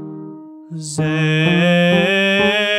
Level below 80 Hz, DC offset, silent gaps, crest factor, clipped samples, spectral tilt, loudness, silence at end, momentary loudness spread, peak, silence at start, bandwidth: -54 dBFS; under 0.1%; none; 14 dB; under 0.1%; -5.5 dB/octave; -15 LUFS; 0 s; 19 LU; -2 dBFS; 0 s; 12 kHz